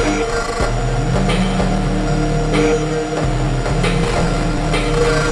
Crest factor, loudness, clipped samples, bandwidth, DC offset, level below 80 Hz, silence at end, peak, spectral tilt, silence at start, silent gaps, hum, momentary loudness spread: 12 dB; -17 LUFS; under 0.1%; 11.5 kHz; under 0.1%; -22 dBFS; 0 s; -4 dBFS; -5.5 dB/octave; 0 s; none; none; 3 LU